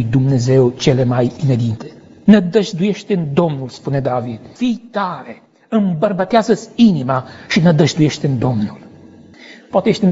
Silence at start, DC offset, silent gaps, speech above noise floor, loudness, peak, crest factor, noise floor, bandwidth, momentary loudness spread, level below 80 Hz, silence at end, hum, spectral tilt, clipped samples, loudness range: 0 s; under 0.1%; none; 26 dB; -16 LUFS; 0 dBFS; 16 dB; -41 dBFS; 8 kHz; 10 LU; -48 dBFS; 0 s; none; -7 dB/octave; under 0.1%; 4 LU